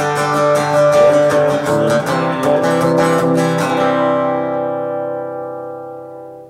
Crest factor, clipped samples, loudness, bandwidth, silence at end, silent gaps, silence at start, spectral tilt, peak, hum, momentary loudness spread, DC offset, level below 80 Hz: 12 dB; under 0.1%; -14 LUFS; 15.5 kHz; 0 s; none; 0 s; -5.5 dB/octave; -2 dBFS; none; 15 LU; under 0.1%; -56 dBFS